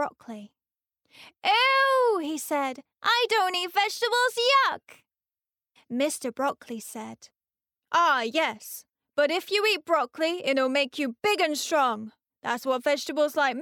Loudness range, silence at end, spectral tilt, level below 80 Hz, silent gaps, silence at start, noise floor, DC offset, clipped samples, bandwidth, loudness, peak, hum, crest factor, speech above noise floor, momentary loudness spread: 5 LU; 0 s; -1.5 dB/octave; -82 dBFS; none; 0 s; under -90 dBFS; under 0.1%; under 0.1%; 19 kHz; -25 LUFS; -12 dBFS; none; 14 dB; over 64 dB; 16 LU